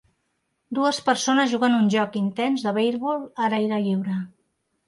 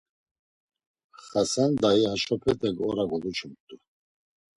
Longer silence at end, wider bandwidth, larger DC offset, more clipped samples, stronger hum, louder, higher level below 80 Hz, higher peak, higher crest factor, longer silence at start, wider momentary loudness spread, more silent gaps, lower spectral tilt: second, 0.6 s vs 0.85 s; about the same, 11.5 kHz vs 11.5 kHz; neither; neither; neither; first, -23 LUFS vs -26 LUFS; second, -72 dBFS vs -58 dBFS; about the same, -8 dBFS vs -10 dBFS; about the same, 16 dB vs 18 dB; second, 0.7 s vs 1.25 s; about the same, 8 LU vs 10 LU; second, none vs 3.60-3.68 s; about the same, -5 dB/octave vs -5 dB/octave